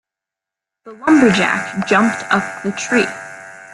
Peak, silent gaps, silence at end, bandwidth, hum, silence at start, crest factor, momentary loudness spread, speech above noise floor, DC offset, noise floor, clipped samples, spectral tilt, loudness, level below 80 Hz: 0 dBFS; none; 0 s; 12 kHz; none; 0.85 s; 16 dB; 15 LU; 70 dB; under 0.1%; -85 dBFS; under 0.1%; -4.5 dB/octave; -15 LUFS; -56 dBFS